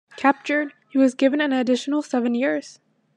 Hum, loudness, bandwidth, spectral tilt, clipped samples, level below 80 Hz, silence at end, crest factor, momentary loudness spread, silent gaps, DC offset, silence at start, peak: none; -22 LUFS; 10 kHz; -4 dB/octave; under 0.1%; -82 dBFS; 0.45 s; 18 dB; 6 LU; none; under 0.1%; 0.15 s; -4 dBFS